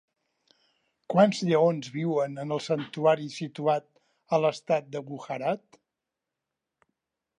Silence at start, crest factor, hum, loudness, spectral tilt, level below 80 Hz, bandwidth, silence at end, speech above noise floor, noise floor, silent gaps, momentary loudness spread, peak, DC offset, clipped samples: 1.1 s; 22 dB; none; -27 LUFS; -6.5 dB/octave; -80 dBFS; 10.5 kHz; 1.8 s; 60 dB; -87 dBFS; none; 12 LU; -8 dBFS; under 0.1%; under 0.1%